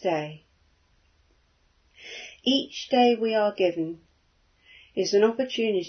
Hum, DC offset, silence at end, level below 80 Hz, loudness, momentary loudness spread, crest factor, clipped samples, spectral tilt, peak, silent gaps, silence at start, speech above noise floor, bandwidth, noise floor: none; under 0.1%; 0 s; -68 dBFS; -25 LUFS; 18 LU; 20 dB; under 0.1%; -4.5 dB/octave; -8 dBFS; none; 0 s; 41 dB; 6.6 kHz; -65 dBFS